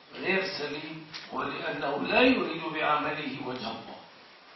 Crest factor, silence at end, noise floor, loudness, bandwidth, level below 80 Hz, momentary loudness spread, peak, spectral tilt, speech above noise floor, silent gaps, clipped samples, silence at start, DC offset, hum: 22 dB; 0 s; -53 dBFS; -29 LUFS; 6.2 kHz; -64 dBFS; 17 LU; -8 dBFS; -5.5 dB/octave; 23 dB; none; under 0.1%; 0.05 s; under 0.1%; none